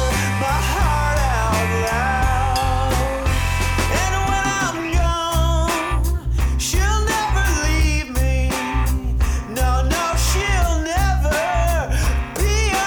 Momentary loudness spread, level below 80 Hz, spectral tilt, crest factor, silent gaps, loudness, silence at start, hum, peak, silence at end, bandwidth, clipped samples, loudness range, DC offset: 3 LU; -20 dBFS; -4.5 dB/octave; 12 dB; none; -19 LUFS; 0 s; none; -6 dBFS; 0 s; over 20 kHz; under 0.1%; 1 LU; under 0.1%